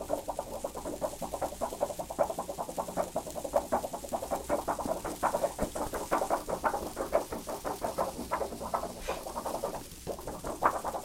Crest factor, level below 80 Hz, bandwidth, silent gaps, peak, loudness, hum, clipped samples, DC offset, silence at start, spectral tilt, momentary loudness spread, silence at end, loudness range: 26 dB; -50 dBFS; 16.5 kHz; none; -8 dBFS; -35 LUFS; none; under 0.1%; under 0.1%; 0 s; -4 dB/octave; 7 LU; 0 s; 3 LU